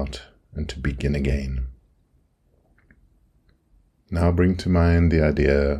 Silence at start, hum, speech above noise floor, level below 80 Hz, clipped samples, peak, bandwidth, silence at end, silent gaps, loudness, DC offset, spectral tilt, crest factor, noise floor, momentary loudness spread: 0 s; none; 43 dB; -30 dBFS; under 0.1%; -4 dBFS; 9.8 kHz; 0 s; none; -22 LUFS; under 0.1%; -8 dB/octave; 18 dB; -63 dBFS; 15 LU